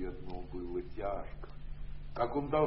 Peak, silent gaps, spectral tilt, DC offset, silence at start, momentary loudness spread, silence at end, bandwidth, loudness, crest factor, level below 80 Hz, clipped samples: -18 dBFS; none; -6.5 dB/octave; under 0.1%; 0 s; 15 LU; 0 s; 5.6 kHz; -40 LUFS; 18 dB; -46 dBFS; under 0.1%